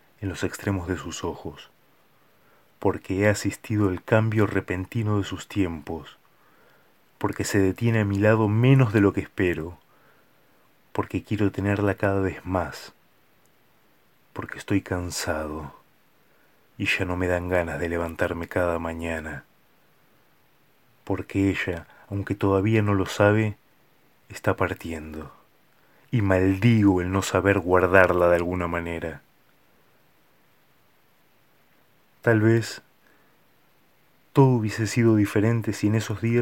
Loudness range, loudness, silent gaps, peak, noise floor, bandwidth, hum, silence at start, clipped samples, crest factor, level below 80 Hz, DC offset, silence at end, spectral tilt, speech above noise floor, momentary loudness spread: 9 LU; -24 LUFS; none; 0 dBFS; -63 dBFS; 17 kHz; none; 0.2 s; under 0.1%; 26 dB; -52 dBFS; under 0.1%; 0 s; -6.5 dB/octave; 40 dB; 15 LU